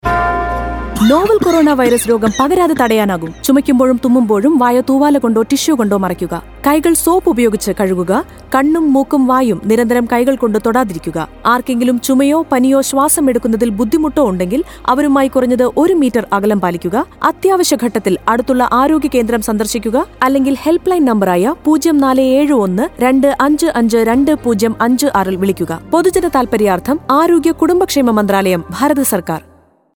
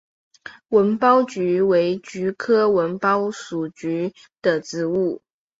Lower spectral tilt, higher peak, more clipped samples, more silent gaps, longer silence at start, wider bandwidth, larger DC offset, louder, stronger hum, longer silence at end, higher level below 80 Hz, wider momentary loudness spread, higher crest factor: about the same, -5 dB/octave vs -6 dB/octave; first, 0 dBFS vs -4 dBFS; neither; neither; second, 0.05 s vs 0.45 s; first, over 20 kHz vs 7.8 kHz; neither; first, -12 LUFS vs -21 LUFS; neither; first, 0.55 s vs 0.4 s; first, -36 dBFS vs -64 dBFS; second, 5 LU vs 11 LU; second, 12 dB vs 18 dB